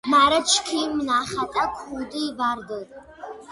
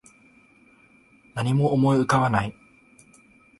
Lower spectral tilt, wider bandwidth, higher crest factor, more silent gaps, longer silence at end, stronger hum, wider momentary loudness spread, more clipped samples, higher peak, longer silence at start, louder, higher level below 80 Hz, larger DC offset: second, -1.5 dB/octave vs -7 dB/octave; about the same, 11.5 kHz vs 11.5 kHz; about the same, 18 dB vs 18 dB; neither; second, 0 s vs 1.1 s; neither; first, 22 LU vs 13 LU; neither; about the same, -6 dBFS vs -8 dBFS; second, 0.05 s vs 1.35 s; about the same, -22 LUFS vs -22 LUFS; about the same, -54 dBFS vs -54 dBFS; neither